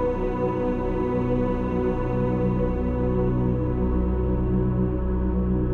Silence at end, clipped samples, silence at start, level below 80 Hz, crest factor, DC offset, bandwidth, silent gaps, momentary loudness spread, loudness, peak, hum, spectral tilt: 0 s; under 0.1%; 0 s; -28 dBFS; 12 dB; under 0.1%; 4.2 kHz; none; 2 LU; -25 LUFS; -10 dBFS; none; -11 dB/octave